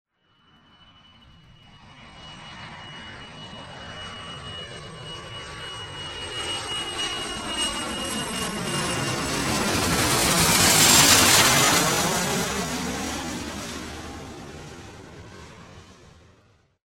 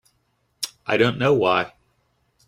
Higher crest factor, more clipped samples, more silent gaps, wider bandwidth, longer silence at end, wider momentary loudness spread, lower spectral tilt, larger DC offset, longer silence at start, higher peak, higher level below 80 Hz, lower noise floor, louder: first, 24 dB vs 18 dB; neither; neither; about the same, 16.5 kHz vs 15.5 kHz; about the same, 0.9 s vs 0.8 s; first, 25 LU vs 13 LU; second, -2 dB/octave vs -5 dB/octave; neither; first, 1.75 s vs 0.6 s; first, -2 dBFS vs -6 dBFS; first, -46 dBFS vs -60 dBFS; second, -61 dBFS vs -69 dBFS; about the same, -20 LUFS vs -21 LUFS